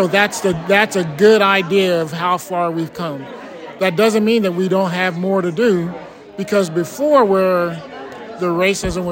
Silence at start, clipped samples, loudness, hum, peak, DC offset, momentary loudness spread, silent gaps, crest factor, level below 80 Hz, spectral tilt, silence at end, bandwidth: 0 s; under 0.1%; -16 LUFS; none; 0 dBFS; under 0.1%; 17 LU; none; 16 dB; -46 dBFS; -5 dB/octave; 0 s; 16.5 kHz